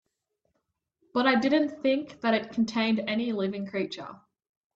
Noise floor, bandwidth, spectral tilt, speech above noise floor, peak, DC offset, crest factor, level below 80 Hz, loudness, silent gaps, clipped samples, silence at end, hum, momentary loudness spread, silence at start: -80 dBFS; 7.6 kHz; -5.5 dB/octave; 53 dB; -12 dBFS; under 0.1%; 18 dB; -70 dBFS; -27 LUFS; none; under 0.1%; 0.6 s; none; 9 LU; 1.15 s